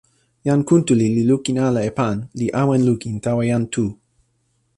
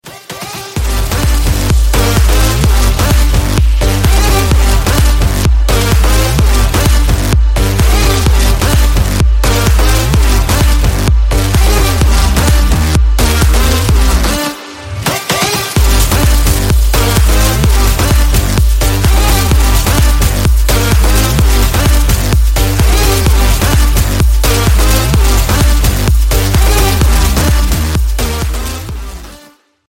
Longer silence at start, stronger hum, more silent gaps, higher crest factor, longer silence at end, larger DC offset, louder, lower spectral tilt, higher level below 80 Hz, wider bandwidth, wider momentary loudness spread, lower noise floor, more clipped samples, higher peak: first, 0.45 s vs 0.05 s; neither; neither; first, 16 dB vs 8 dB; first, 0.85 s vs 0.5 s; neither; second, -19 LUFS vs -11 LUFS; first, -7 dB/octave vs -4.5 dB/octave; second, -52 dBFS vs -10 dBFS; second, 11 kHz vs 17 kHz; first, 7 LU vs 4 LU; first, -66 dBFS vs -42 dBFS; neither; second, -4 dBFS vs 0 dBFS